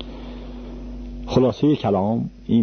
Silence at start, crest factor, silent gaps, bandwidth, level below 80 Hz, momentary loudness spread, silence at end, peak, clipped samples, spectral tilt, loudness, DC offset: 0 s; 16 dB; none; 6.6 kHz; -38 dBFS; 18 LU; 0 s; -4 dBFS; under 0.1%; -8.5 dB/octave; -20 LUFS; under 0.1%